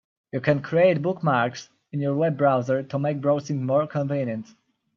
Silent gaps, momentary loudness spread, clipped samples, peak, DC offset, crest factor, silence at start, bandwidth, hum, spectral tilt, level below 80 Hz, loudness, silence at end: none; 10 LU; under 0.1%; -6 dBFS; under 0.1%; 18 dB; 0.35 s; 7.2 kHz; none; -7.5 dB/octave; -68 dBFS; -24 LUFS; 0.55 s